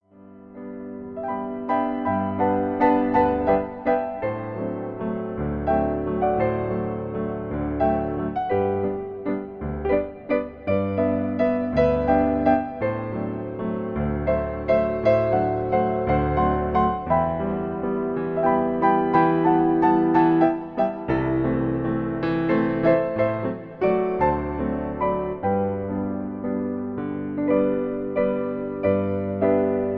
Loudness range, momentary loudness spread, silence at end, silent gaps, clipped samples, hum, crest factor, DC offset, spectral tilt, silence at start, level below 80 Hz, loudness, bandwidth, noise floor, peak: 5 LU; 10 LU; 0 s; none; under 0.1%; none; 16 dB; under 0.1%; -10.5 dB/octave; 0.2 s; -42 dBFS; -23 LUFS; 5.2 kHz; -47 dBFS; -6 dBFS